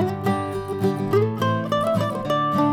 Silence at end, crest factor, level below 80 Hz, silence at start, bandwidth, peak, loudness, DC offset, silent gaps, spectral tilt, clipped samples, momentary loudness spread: 0 s; 14 dB; -52 dBFS; 0 s; 16.5 kHz; -8 dBFS; -23 LUFS; under 0.1%; none; -7 dB/octave; under 0.1%; 4 LU